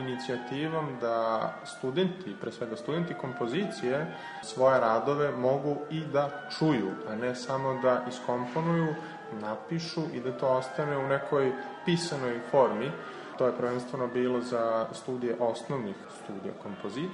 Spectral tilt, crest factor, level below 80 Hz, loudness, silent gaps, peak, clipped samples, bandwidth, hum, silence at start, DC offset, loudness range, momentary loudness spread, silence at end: -6 dB/octave; 18 dB; -72 dBFS; -31 LUFS; none; -12 dBFS; under 0.1%; 10.5 kHz; none; 0 s; under 0.1%; 4 LU; 11 LU; 0 s